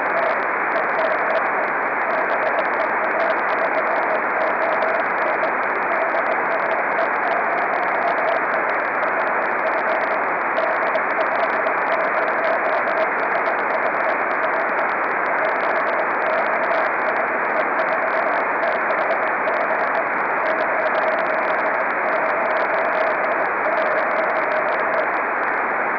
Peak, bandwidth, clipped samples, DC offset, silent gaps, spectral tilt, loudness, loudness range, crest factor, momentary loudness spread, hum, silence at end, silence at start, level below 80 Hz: -8 dBFS; 5.4 kHz; under 0.1%; under 0.1%; none; -6 dB/octave; -20 LUFS; 0 LU; 12 dB; 1 LU; none; 0 s; 0 s; -60 dBFS